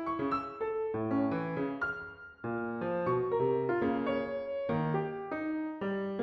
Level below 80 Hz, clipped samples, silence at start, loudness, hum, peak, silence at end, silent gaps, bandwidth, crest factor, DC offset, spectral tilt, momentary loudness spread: -64 dBFS; under 0.1%; 0 s; -34 LUFS; none; -20 dBFS; 0 s; none; 6.2 kHz; 14 dB; under 0.1%; -9.5 dB/octave; 7 LU